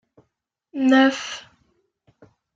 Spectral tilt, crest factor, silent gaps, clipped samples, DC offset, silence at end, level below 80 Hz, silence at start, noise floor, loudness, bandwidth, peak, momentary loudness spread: -3 dB/octave; 20 dB; none; under 0.1%; under 0.1%; 1.15 s; -70 dBFS; 0.75 s; -76 dBFS; -19 LUFS; 7.6 kHz; -4 dBFS; 20 LU